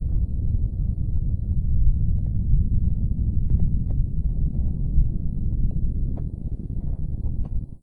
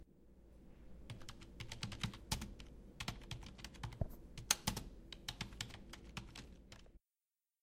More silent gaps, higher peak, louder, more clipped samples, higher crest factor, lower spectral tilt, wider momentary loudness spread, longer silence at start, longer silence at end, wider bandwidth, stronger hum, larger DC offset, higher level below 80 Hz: neither; first, -6 dBFS vs -10 dBFS; first, -26 LUFS vs -46 LUFS; neither; second, 14 dB vs 38 dB; first, -13.5 dB/octave vs -2.5 dB/octave; second, 7 LU vs 22 LU; about the same, 0 s vs 0 s; second, 0.05 s vs 0.65 s; second, 1 kHz vs 16 kHz; neither; neither; first, -24 dBFS vs -56 dBFS